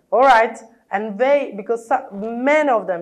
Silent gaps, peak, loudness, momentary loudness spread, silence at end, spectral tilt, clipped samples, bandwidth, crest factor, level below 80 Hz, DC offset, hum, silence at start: none; -4 dBFS; -18 LUFS; 12 LU; 0 s; -5 dB/octave; under 0.1%; 11 kHz; 14 dB; -58 dBFS; under 0.1%; none; 0.1 s